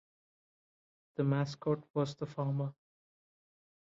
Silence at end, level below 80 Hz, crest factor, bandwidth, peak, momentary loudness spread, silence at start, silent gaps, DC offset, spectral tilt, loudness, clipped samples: 1.15 s; -76 dBFS; 18 dB; 7.6 kHz; -20 dBFS; 6 LU; 1.2 s; 1.90-1.94 s; under 0.1%; -7.5 dB/octave; -36 LUFS; under 0.1%